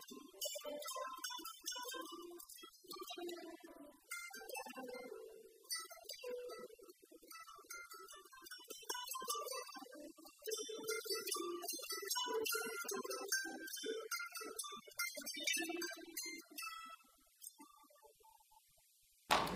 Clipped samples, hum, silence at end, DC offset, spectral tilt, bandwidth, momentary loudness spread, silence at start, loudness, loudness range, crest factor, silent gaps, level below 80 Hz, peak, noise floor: under 0.1%; none; 0 s; under 0.1%; -1 dB/octave; 15.5 kHz; 16 LU; 0 s; -45 LUFS; 9 LU; 30 dB; none; -78 dBFS; -18 dBFS; -73 dBFS